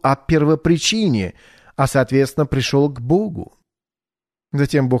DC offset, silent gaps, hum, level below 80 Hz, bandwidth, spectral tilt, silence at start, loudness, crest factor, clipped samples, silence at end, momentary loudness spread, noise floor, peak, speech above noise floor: under 0.1%; none; none; -42 dBFS; 13.5 kHz; -5.5 dB/octave; 0.05 s; -18 LUFS; 14 dB; under 0.1%; 0 s; 11 LU; under -90 dBFS; -4 dBFS; over 73 dB